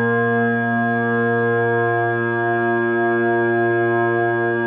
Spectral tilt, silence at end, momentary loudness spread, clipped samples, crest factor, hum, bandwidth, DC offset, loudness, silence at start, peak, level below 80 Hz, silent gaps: -12 dB/octave; 0 s; 1 LU; under 0.1%; 10 dB; none; 3.7 kHz; under 0.1%; -18 LUFS; 0 s; -8 dBFS; -66 dBFS; none